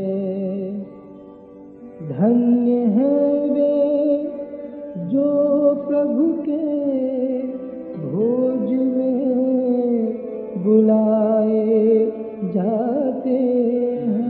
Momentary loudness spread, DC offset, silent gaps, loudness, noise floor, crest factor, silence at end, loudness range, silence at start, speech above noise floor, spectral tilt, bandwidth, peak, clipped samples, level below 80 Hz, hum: 12 LU; under 0.1%; none; -19 LUFS; -41 dBFS; 14 dB; 0 s; 3 LU; 0 s; 23 dB; -13 dB/octave; 4.2 kHz; -4 dBFS; under 0.1%; -64 dBFS; none